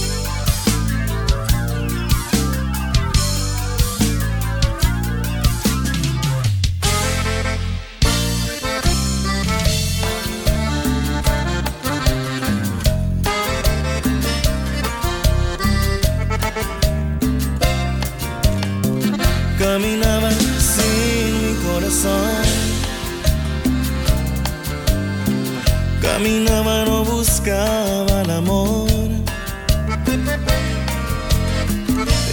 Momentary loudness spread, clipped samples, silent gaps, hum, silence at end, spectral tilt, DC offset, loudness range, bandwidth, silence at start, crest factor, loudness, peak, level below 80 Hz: 5 LU; under 0.1%; none; none; 0 s; -4.5 dB/octave; under 0.1%; 3 LU; 19.5 kHz; 0 s; 16 dB; -19 LUFS; -2 dBFS; -22 dBFS